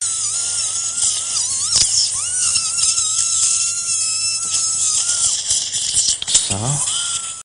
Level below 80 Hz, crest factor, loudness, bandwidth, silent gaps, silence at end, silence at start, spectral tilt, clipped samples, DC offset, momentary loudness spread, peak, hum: -50 dBFS; 18 dB; -15 LUFS; 10.5 kHz; none; 0 s; 0 s; 0.5 dB/octave; under 0.1%; under 0.1%; 4 LU; 0 dBFS; none